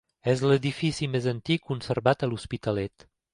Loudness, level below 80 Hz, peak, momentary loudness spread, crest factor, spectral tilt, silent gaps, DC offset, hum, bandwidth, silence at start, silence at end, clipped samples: -27 LUFS; -54 dBFS; -6 dBFS; 7 LU; 20 dB; -6.5 dB/octave; none; under 0.1%; none; 11 kHz; 0.25 s; 0.45 s; under 0.1%